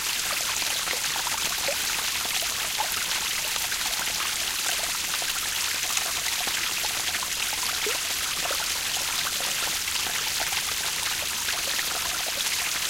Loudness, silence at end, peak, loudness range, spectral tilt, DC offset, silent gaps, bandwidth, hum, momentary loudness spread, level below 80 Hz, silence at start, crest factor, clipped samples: -25 LUFS; 0 s; -8 dBFS; 0 LU; 1 dB/octave; under 0.1%; none; 17 kHz; none; 1 LU; -54 dBFS; 0 s; 20 dB; under 0.1%